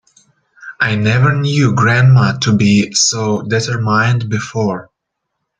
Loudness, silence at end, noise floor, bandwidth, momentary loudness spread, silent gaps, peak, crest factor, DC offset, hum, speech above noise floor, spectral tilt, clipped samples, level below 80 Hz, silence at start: -13 LUFS; 0.75 s; -75 dBFS; 9.2 kHz; 8 LU; none; 0 dBFS; 14 dB; under 0.1%; none; 62 dB; -5 dB/octave; under 0.1%; -48 dBFS; 0.6 s